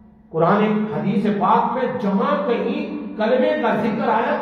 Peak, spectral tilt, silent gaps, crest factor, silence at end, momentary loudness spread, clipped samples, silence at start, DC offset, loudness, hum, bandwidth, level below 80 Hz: -4 dBFS; -8.5 dB/octave; none; 16 dB; 0 s; 6 LU; under 0.1%; 0.3 s; under 0.1%; -20 LUFS; none; 6.2 kHz; -58 dBFS